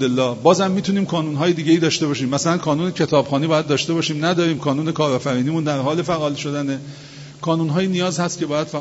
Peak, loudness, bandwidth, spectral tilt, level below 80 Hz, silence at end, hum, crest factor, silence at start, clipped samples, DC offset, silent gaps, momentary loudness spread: 0 dBFS; -19 LUFS; 8 kHz; -5.5 dB/octave; -58 dBFS; 0 s; none; 18 dB; 0 s; under 0.1%; under 0.1%; none; 7 LU